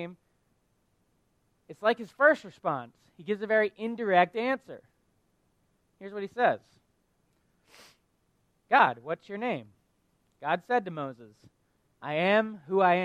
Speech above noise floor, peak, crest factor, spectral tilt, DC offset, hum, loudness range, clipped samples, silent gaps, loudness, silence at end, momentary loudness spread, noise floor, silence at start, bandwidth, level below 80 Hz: 44 dB; -8 dBFS; 22 dB; -6.5 dB/octave; under 0.1%; none; 8 LU; under 0.1%; none; -28 LUFS; 0 s; 16 LU; -72 dBFS; 0 s; 11 kHz; -76 dBFS